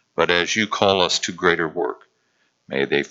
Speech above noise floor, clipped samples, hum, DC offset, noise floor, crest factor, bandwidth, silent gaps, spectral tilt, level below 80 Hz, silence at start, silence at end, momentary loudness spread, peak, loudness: 46 dB; under 0.1%; none; under 0.1%; -67 dBFS; 22 dB; 8 kHz; none; -3 dB/octave; -58 dBFS; 0.2 s; 0.05 s; 10 LU; 0 dBFS; -20 LUFS